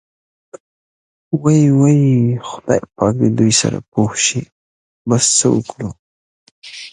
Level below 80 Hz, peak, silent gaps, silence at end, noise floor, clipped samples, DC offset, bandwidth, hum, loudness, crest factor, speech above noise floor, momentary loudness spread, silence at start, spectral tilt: -50 dBFS; 0 dBFS; 0.60-1.31 s, 3.88-3.92 s, 4.52-5.05 s, 5.99-6.62 s; 0.05 s; under -90 dBFS; under 0.1%; under 0.1%; 11 kHz; none; -14 LUFS; 16 dB; over 76 dB; 16 LU; 0.55 s; -5 dB/octave